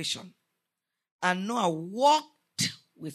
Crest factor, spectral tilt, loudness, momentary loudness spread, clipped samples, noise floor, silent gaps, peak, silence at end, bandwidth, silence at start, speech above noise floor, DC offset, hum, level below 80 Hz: 20 dB; -3.5 dB/octave; -28 LUFS; 12 LU; under 0.1%; -86 dBFS; 1.11-1.19 s; -10 dBFS; 0 s; 13.5 kHz; 0 s; 59 dB; under 0.1%; none; -80 dBFS